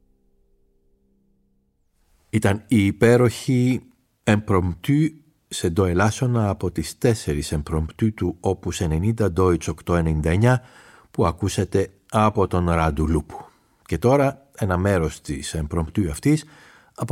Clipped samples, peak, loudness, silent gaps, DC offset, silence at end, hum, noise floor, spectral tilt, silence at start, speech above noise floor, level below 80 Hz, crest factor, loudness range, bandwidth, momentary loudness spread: under 0.1%; -4 dBFS; -22 LUFS; none; under 0.1%; 0 s; none; -66 dBFS; -6.5 dB/octave; 2.35 s; 45 dB; -38 dBFS; 18 dB; 2 LU; 16 kHz; 9 LU